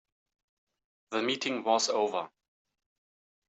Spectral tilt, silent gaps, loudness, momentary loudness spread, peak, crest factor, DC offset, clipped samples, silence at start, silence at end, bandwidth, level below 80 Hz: -2 dB/octave; none; -30 LUFS; 10 LU; -12 dBFS; 22 dB; under 0.1%; under 0.1%; 1.1 s; 1.2 s; 8.2 kHz; -86 dBFS